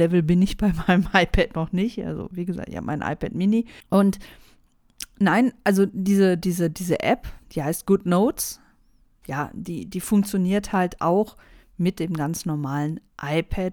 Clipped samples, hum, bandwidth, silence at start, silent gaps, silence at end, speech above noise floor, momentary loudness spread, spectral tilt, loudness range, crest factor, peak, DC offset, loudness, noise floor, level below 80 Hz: under 0.1%; none; 19.5 kHz; 0 s; none; 0 s; 36 dB; 11 LU; -6 dB/octave; 3 LU; 20 dB; -2 dBFS; under 0.1%; -23 LUFS; -58 dBFS; -40 dBFS